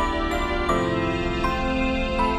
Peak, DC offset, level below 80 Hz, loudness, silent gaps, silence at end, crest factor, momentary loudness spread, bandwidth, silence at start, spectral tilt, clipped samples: -10 dBFS; under 0.1%; -30 dBFS; -24 LUFS; none; 0 s; 14 dB; 2 LU; 13.5 kHz; 0 s; -6 dB/octave; under 0.1%